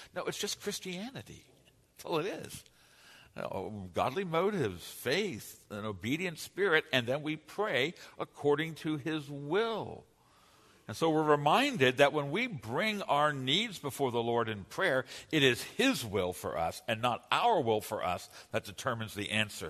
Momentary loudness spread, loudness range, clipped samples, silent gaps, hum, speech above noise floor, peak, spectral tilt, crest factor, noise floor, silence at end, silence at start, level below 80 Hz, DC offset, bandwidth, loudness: 13 LU; 7 LU; under 0.1%; none; none; 31 dB; -10 dBFS; -4.5 dB/octave; 24 dB; -64 dBFS; 0 s; 0 s; -68 dBFS; under 0.1%; 13.5 kHz; -32 LUFS